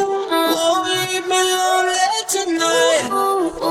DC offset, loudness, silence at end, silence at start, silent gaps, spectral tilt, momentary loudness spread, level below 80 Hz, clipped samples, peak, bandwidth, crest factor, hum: under 0.1%; -17 LUFS; 0 s; 0 s; none; -1.5 dB/octave; 4 LU; -54 dBFS; under 0.1%; -4 dBFS; 17.5 kHz; 14 dB; none